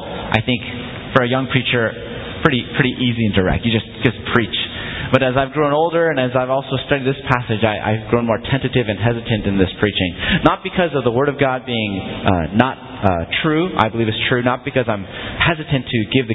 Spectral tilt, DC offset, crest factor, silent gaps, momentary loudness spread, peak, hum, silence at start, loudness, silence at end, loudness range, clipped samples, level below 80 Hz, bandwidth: -8.5 dB/octave; under 0.1%; 18 dB; none; 5 LU; 0 dBFS; none; 0 s; -18 LUFS; 0 s; 1 LU; under 0.1%; -36 dBFS; 8 kHz